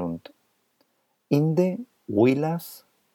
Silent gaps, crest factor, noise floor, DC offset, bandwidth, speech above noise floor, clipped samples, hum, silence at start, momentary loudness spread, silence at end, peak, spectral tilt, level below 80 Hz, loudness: none; 18 dB; -69 dBFS; under 0.1%; 18 kHz; 47 dB; under 0.1%; none; 0 s; 15 LU; 0.35 s; -8 dBFS; -8 dB/octave; -70 dBFS; -24 LUFS